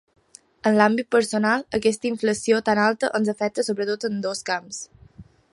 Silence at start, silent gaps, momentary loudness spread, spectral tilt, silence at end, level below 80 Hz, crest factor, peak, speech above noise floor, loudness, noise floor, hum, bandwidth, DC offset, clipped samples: 0.65 s; none; 9 LU; -4.5 dB/octave; 0.3 s; -60 dBFS; 20 dB; -2 dBFS; 26 dB; -22 LUFS; -48 dBFS; none; 11.5 kHz; under 0.1%; under 0.1%